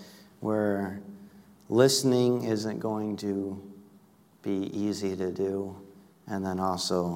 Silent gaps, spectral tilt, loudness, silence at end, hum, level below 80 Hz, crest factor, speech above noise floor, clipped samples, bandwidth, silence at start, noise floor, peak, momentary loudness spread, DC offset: none; -5 dB/octave; -29 LUFS; 0 s; none; -70 dBFS; 22 dB; 31 dB; under 0.1%; 16 kHz; 0 s; -59 dBFS; -6 dBFS; 17 LU; under 0.1%